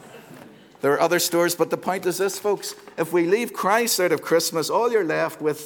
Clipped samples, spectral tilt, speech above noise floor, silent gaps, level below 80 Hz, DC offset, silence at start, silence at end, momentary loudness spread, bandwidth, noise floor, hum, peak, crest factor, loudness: under 0.1%; -3.5 dB/octave; 24 dB; none; -74 dBFS; under 0.1%; 0 s; 0 s; 6 LU; over 20 kHz; -46 dBFS; none; -6 dBFS; 16 dB; -22 LUFS